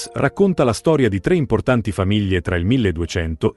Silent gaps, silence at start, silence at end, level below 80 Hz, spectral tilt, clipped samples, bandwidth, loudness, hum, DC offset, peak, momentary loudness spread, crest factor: none; 0 s; 0.05 s; -38 dBFS; -6.5 dB/octave; under 0.1%; 12 kHz; -18 LUFS; none; under 0.1%; -2 dBFS; 4 LU; 16 dB